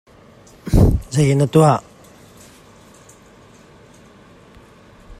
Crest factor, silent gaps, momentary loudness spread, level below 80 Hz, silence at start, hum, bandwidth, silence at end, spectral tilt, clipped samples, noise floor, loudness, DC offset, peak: 20 dB; none; 8 LU; -30 dBFS; 0.65 s; none; 15 kHz; 0.05 s; -7 dB/octave; under 0.1%; -46 dBFS; -16 LUFS; under 0.1%; 0 dBFS